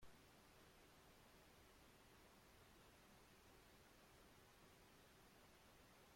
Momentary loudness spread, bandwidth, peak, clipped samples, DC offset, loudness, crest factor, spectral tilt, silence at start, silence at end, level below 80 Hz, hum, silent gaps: 0 LU; 16.5 kHz; -52 dBFS; under 0.1%; under 0.1%; -69 LUFS; 16 dB; -3.5 dB/octave; 0 s; 0 s; -78 dBFS; none; none